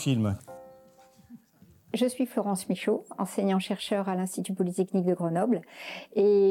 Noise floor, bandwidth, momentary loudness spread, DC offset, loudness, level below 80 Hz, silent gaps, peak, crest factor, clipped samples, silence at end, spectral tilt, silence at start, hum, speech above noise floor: -59 dBFS; 16.5 kHz; 10 LU; under 0.1%; -29 LUFS; -70 dBFS; none; -14 dBFS; 14 dB; under 0.1%; 0 s; -6 dB/octave; 0 s; none; 32 dB